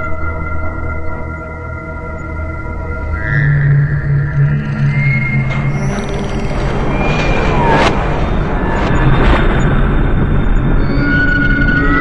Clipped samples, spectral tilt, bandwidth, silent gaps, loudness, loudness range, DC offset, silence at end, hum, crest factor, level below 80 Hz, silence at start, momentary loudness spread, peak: under 0.1%; -7.5 dB/octave; 8.4 kHz; none; -15 LUFS; 4 LU; under 0.1%; 0 s; none; 12 dB; -18 dBFS; 0 s; 11 LU; 0 dBFS